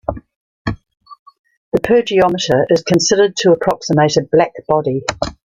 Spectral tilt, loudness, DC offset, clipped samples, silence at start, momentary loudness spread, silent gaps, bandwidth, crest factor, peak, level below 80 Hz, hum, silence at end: -4.5 dB/octave; -15 LUFS; under 0.1%; under 0.1%; 0.1 s; 13 LU; 0.35-0.65 s, 1.19-1.26 s, 1.39-1.44 s, 1.57-1.72 s; 15 kHz; 14 dB; -2 dBFS; -42 dBFS; none; 0.25 s